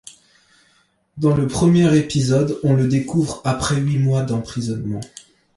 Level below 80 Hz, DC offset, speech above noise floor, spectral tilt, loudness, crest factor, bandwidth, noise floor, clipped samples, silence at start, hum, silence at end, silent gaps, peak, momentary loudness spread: -46 dBFS; under 0.1%; 43 dB; -6.5 dB/octave; -19 LUFS; 14 dB; 11.5 kHz; -60 dBFS; under 0.1%; 1.15 s; none; 0.5 s; none; -4 dBFS; 10 LU